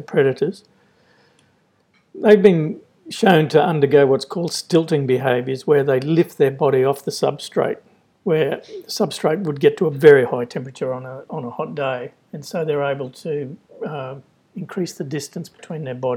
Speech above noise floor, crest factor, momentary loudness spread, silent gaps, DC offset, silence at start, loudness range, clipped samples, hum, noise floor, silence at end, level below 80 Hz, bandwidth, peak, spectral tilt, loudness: 42 dB; 20 dB; 17 LU; none; under 0.1%; 0 s; 10 LU; under 0.1%; none; -61 dBFS; 0 s; -68 dBFS; 16 kHz; 0 dBFS; -6 dB/octave; -19 LUFS